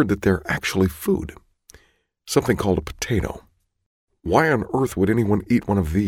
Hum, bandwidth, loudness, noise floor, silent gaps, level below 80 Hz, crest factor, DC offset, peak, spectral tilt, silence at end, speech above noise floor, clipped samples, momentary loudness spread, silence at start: none; 17.5 kHz; -21 LUFS; -62 dBFS; 3.86-4.08 s; -40 dBFS; 18 dB; under 0.1%; -4 dBFS; -6 dB/octave; 0 s; 42 dB; under 0.1%; 6 LU; 0 s